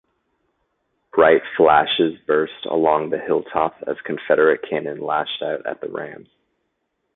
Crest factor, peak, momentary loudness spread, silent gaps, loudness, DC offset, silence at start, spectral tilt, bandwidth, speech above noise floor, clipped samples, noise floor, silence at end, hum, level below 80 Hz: 20 dB; -2 dBFS; 13 LU; none; -19 LUFS; under 0.1%; 1.15 s; -9.5 dB/octave; 4.1 kHz; 54 dB; under 0.1%; -73 dBFS; 1 s; none; -58 dBFS